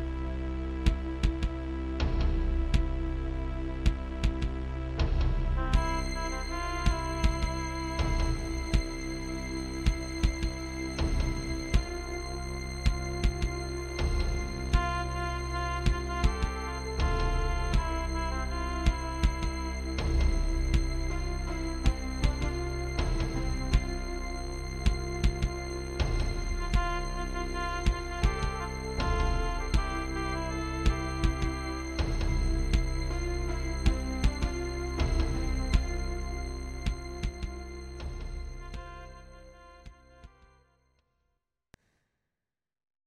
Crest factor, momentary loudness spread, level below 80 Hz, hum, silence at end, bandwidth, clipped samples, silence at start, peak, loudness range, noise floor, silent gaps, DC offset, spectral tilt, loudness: 20 dB; 7 LU; -32 dBFS; none; 2.8 s; 13 kHz; under 0.1%; 0 s; -10 dBFS; 3 LU; under -90 dBFS; none; under 0.1%; -5.5 dB/octave; -33 LUFS